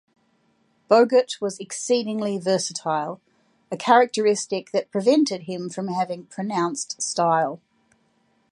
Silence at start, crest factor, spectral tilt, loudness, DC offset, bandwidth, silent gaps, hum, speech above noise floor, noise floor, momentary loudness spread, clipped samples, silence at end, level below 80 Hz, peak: 0.9 s; 20 dB; -4 dB/octave; -22 LUFS; under 0.1%; 11.5 kHz; none; none; 43 dB; -65 dBFS; 13 LU; under 0.1%; 0.95 s; -76 dBFS; -2 dBFS